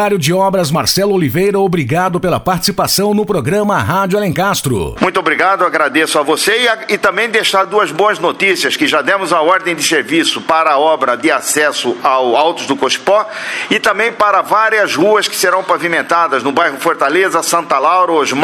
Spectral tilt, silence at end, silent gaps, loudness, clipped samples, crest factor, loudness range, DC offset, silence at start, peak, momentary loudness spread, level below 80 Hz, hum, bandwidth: -3.5 dB/octave; 0 s; none; -12 LUFS; under 0.1%; 12 dB; 1 LU; under 0.1%; 0 s; 0 dBFS; 3 LU; -44 dBFS; none; over 20 kHz